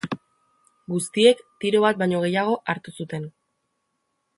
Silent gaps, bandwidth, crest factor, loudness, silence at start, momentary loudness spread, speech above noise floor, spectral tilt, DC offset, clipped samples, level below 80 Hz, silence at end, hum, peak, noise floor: none; 11.5 kHz; 22 dB; -22 LUFS; 0.05 s; 15 LU; 53 dB; -5 dB/octave; under 0.1%; under 0.1%; -68 dBFS; 1.1 s; none; -2 dBFS; -75 dBFS